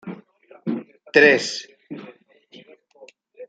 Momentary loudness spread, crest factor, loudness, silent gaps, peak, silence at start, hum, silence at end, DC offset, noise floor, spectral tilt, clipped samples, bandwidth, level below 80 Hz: 24 LU; 22 dB; -19 LUFS; none; -2 dBFS; 0.05 s; none; 0.05 s; under 0.1%; -50 dBFS; -3.5 dB/octave; under 0.1%; 9.2 kHz; -74 dBFS